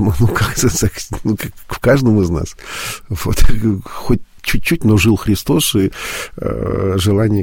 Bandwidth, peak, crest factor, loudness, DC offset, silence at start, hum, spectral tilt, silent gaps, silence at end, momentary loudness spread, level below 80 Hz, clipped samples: 17 kHz; 0 dBFS; 14 dB; -16 LUFS; under 0.1%; 0 s; none; -5.5 dB/octave; none; 0 s; 11 LU; -24 dBFS; under 0.1%